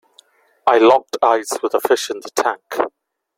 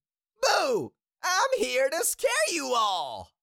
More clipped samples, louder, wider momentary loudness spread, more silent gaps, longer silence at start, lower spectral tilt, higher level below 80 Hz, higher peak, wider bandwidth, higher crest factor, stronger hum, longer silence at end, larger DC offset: neither; first, -17 LUFS vs -26 LUFS; first, 11 LU vs 8 LU; neither; first, 0.65 s vs 0.4 s; first, -2.5 dB/octave vs -1 dB/octave; about the same, -66 dBFS vs -66 dBFS; first, 0 dBFS vs -12 dBFS; about the same, 16.5 kHz vs 17 kHz; about the same, 18 dB vs 16 dB; neither; first, 0.5 s vs 0.15 s; neither